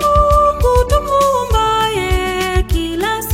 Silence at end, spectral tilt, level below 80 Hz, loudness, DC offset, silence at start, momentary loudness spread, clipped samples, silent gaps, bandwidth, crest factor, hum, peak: 0 s; -5 dB/octave; -20 dBFS; -14 LUFS; under 0.1%; 0 s; 6 LU; under 0.1%; none; 16.5 kHz; 14 dB; none; 0 dBFS